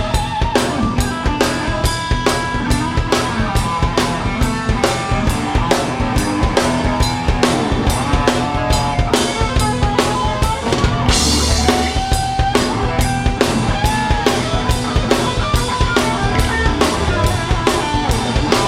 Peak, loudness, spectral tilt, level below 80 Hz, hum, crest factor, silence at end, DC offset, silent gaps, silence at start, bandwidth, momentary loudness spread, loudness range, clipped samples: 0 dBFS; -16 LUFS; -4.5 dB/octave; -22 dBFS; none; 16 dB; 0 s; under 0.1%; none; 0 s; 16 kHz; 3 LU; 2 LU; under 0.1%